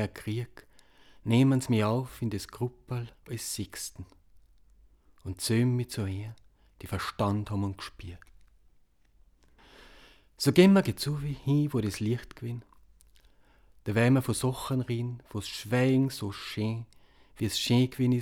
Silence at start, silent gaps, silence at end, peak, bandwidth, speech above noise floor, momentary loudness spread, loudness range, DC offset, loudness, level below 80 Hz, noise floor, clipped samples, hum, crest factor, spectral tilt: 0 s; none; 0 s; -8 dBFS; 17.5 kHz; 34 dB; 16 LU; 9 LU; under 0.1%; -29 LUFS; -58 dBFS; -63 dBFS; under 0.1%; none; 22 dB; -6 dB/octave